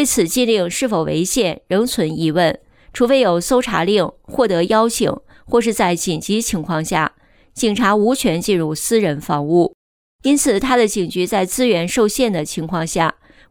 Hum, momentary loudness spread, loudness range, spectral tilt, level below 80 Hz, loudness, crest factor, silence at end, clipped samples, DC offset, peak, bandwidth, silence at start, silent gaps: none; 6 LU; 1 LU; -4 dB/octave; -44 dBFS; -17 LUFS; 14 dB; 0.4 s; under 0.1%; under 0.1%; -2 dBFS; over 20 kHz; 0 s; 9.74-10.19 s